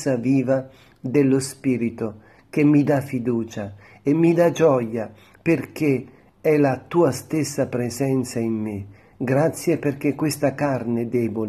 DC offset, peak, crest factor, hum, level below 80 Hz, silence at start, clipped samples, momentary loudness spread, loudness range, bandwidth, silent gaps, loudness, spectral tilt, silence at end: under 0.1%; -6 dBFS; 16 dB; none; -60 dBFS; 0 s; under 0.1%; 13 LU; 3 LU; 13.5 kHz; none; -22 LUFS; -7 dB/octave; 0 s